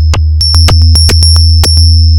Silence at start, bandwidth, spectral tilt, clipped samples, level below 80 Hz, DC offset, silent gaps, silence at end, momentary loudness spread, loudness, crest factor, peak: 0 s; 17 kHz; -4 dB/octave; 2%; -8 dBFS; under 0.1%; none; 0 s; 3 LU; -5 LUFS; 4 dB; 0 dBFS